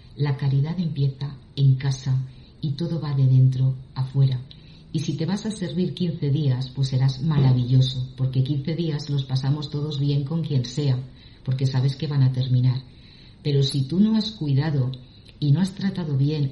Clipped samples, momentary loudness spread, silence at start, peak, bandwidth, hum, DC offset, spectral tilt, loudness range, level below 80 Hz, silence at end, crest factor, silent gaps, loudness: under 0.1%; 9 LU; 0.05 s; -8 dBFS; 11 kHz; none; under 0.1%; -7.5 dB/octave; 2 LU; -50 dBFS; 0 s; 14 dB; none; -23 LUFS